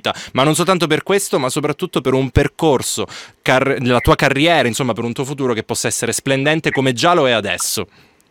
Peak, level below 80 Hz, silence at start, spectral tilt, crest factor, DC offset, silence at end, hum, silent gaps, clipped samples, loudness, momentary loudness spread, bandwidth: 0 dBFS; -38 dBFS; 0.05 s; -4 dB/octave; 16 dB; under 0.1%; 0.45 s; none; none; under 0.1%; -16 LUFS; 8 LU; 18.5 kHz